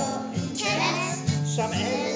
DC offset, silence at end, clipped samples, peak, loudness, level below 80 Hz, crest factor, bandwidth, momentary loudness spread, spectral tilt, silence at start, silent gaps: under 0.1%; 0 s; under 0.1%; -12 dBFS; -26 LUFS; -52 dBFS; 16 dB; 8 kHz; 5 LU; -4.5 dB/octave; 0 s; none